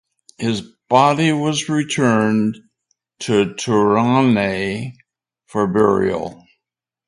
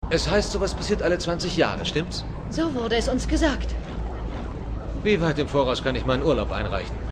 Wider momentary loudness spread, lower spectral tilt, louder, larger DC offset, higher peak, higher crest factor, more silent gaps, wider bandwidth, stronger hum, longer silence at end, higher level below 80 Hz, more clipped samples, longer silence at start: about the same, 12 LU vs 10 LU; about the same, -5.5 dB/octave vs -5 dB/octave; first, -17 LUFS vs -25 LUFS; neither; first, 0 dBFS vs -6 dBFS; about the same, 18 dB vs 18 dB; neither; first, 11.5 kHz vs 10 kHz; neither; first, 0.75 s vs 0 s; second, -52 dBFS vs -32 dBFS; neither; first, 0.4 s vs 0 s